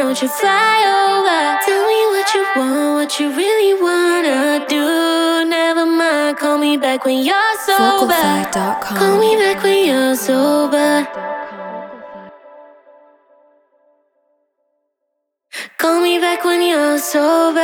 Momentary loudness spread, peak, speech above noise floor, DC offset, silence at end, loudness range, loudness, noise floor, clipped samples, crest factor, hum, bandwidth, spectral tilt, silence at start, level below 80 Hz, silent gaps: 6 LU; -2 dBFS; 59 dB; under 0.1%; 0 s; 8 LU; -14 LUFS; -74 dBFS; under 0.1%; 14 dB; none; 19.5 kHz; -3 dB/octave; 0 s; -62 dBFS; none